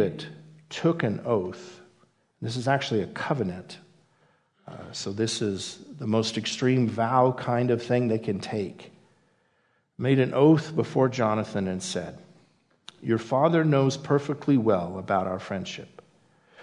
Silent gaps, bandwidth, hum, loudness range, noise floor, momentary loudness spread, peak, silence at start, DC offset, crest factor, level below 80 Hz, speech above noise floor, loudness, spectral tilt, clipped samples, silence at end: none; 11 kHz; none; 6 LU; -69 dBFS; 16 LU; -8 dBFS; 0 s; under 0.1%; 20 dB; -70 dBFS; 44 dB; -26 LUFS; -6 dB/octave; under 0.1%; 0 s